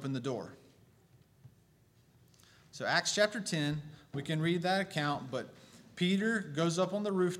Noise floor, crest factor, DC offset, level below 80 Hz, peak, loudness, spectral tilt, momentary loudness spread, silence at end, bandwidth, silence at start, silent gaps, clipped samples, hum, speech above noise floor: -66 dBFS; 22 dB; under 0.1%; -72 dBFS; -12 dBFS; -33 LUFS; -4.5 dB/octave; 12 LU; 0 s; 15.5 kHz; 0 s; none; under 0.1%; none; 33 dB